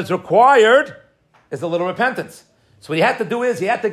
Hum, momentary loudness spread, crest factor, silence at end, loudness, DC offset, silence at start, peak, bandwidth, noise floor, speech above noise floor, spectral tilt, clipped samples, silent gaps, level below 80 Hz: none; 17 LU; 16 dB; 0 s; -16 LUFS; under 0.1%; 0 s; 0 dBFS; 14 kHz; -54 dBFS; 38 dB; -5 dB/octave; under 0.1%; none; -68 dBFS